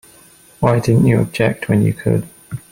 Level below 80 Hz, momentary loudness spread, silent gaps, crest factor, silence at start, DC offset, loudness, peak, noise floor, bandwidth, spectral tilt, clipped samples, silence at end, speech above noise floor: -42 dBFS; 8 LU; none; 16 dB; 0.6 s; under 0.1%; -16 LUFS; -2 dBFS; -46 dBFS; 16 kHz; -7.5 dB/octave; under 0.1%; 0.15 s; 32 dB